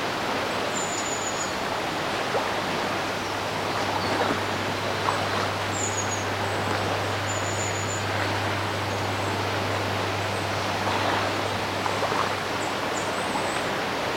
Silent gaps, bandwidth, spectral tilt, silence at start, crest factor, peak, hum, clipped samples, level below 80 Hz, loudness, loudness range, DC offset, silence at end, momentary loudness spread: none; 16.5 kHz; -3.5 dB/octave; 0 s; 18 dB; -10 dBFS; none; under 0.1%; -54 dBFS; -26 LUFS; 1 LU; under 0.1%; 0 s; 2 LU